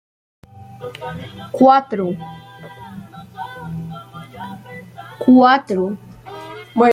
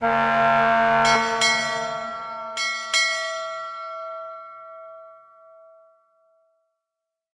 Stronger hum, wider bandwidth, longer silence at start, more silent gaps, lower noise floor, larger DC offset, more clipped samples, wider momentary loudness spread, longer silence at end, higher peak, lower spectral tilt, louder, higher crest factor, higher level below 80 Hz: neither; about the same, 10 kHz vs 11 kHz; first, 0.6 s vs 0 s; neither; second, -37 dBFS vs -85 dBFS; neither; neither; first, 24 LU vs 21 LU; second, 0 s vs 2.2 s; first, -2 dBFS vs -6 dBFS; first, -7 dB/octave vs -2 dB/octave; first, -16 LUFS vs -21 LUFS; about the same, 18 dB vs 18 dB; about the same, -58 dBFS vs -58 dBFS